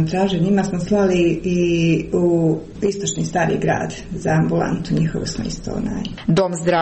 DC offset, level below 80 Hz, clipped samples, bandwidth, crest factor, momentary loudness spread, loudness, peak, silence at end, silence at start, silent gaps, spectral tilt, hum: 0.3%; -40 dBFS; under 0.1%; 8.8 kHz; 12 dB; 8 LU; -19 LUFS; -6 dBFS; 0 s; 0 s; none; -6 dB/octave; none